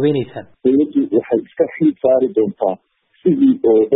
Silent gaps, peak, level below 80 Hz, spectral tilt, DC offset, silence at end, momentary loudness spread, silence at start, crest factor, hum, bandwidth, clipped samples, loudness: none; -2 dBFS; -60 dBFS; -13 dB/octave; under 0.1%; 0 s; 8 LU; 0 s; 12 dB; none; 4.1 kHz; under 0.1%; -16 LUFS